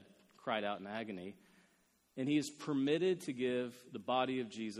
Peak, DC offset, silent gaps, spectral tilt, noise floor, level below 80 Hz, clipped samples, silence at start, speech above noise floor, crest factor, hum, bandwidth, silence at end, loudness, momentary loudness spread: -20 dBFS; under 0.1%; none; -5 dB/octave; -74 dBFS; -82 dBFS; under 0.1%; 0 s; 37 dB; 18 dB; none; 13.5 kHz; 0 s; -38 LUFS; 13 LU